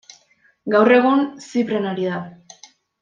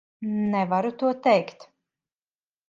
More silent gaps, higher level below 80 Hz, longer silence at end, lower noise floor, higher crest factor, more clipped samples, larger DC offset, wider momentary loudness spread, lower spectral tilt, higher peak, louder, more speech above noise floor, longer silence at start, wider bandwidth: neither; about the same, -70 dBFS vs -72 dBFS; second, 0.65 s vs 1.05 s; second, -59 dBFS vs under -90 dBFS; about the same, 18 dB vs 20 dB; neither; neither; first, 17 LU vs 8 LU; second, -6 dB/octave vs -7.5 dB/octave; first, -2 dBFS vs -6 dBFS; first, -18 LUFS vs -24 LUFS; second, 41 dB vs over 66 dB; first, 0.65 s vs 0.2 s; about the same, 7.6 kHz vs 7.6 kHz